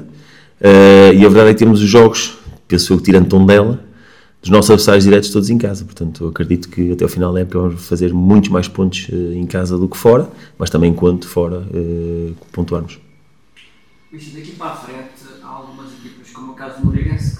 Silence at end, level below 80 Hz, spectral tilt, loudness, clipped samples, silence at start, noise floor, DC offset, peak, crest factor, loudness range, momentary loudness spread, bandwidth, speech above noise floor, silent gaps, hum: 0.05 s; -36 dBFS; -6 dB/octave; -11 LUFS; 2%; 0 s; -52 dBFS; 0.4%; 0 dBFS; 12 dB; 20 LU; 18 LU; 17 kHz; 41 dB; none; none